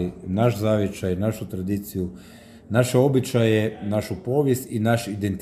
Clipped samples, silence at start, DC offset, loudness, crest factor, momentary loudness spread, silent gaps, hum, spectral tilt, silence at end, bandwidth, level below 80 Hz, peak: under 0.1%; 0 s; under 0.1%; -23 LUFS; 18 dB; 8 LU; none; none; -6.5 dB/octave; 0 s; 15.5 kHz; -52 dBFS; -6 dBFS